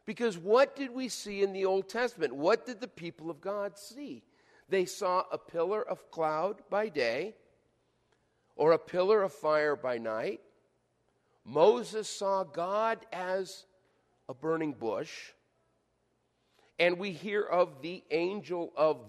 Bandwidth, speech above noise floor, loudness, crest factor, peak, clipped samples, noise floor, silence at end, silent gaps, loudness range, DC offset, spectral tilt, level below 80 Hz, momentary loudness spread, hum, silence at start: 13 kHz; 45 dB; -31 LUFS; 22 dB; -12 dBFS; under 0.1%; -76 dBFS; 0 s; none; 5 LU; under 0.1%; -4.5 dB/octave; -78 dBFS; 15 LU; none; 0.05 s